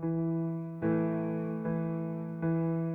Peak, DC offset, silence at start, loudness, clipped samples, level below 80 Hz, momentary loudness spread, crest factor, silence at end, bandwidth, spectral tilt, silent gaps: -20 dBFS; under 0.1%; 0 s; -33 LUFS; under 0.1%; -66 dBFS; 5 LU; 12 dB; 0 s; 2.8 kHz; -12 dB/octave; none